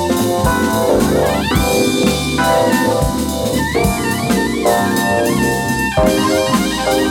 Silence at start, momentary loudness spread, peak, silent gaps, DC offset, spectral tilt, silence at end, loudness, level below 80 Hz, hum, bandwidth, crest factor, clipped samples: 0 s; 3 LU; 0 dBFS; none; under 0.1%; -4.5 dB/octave; 0 s; -15 LUFS; -30 dBFS; none; 18 kHz; 14 dB; under 0.1%